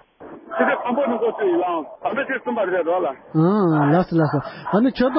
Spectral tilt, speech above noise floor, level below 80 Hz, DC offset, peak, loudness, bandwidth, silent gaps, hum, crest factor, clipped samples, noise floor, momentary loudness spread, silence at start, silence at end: -12.5 dB/octave; 22 dB; -54 dBFS; under 0.1%; -4 dBFS; -20 LUFS; 5.8 kHz; none; none; 16 dB; under 0.1%; -41 dBFS; 7 LU; 0.2 s; 0 s